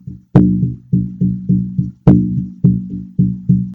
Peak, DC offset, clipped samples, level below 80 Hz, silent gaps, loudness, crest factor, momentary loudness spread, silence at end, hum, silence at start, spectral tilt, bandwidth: 0 dBFS; under 0.1%; 0.3%; -34 dBFS; none; -15 LUFS; 14 dB; 8 LU; 0 s; none; 0.05 s; -12 dB/octave; 3.1 kHz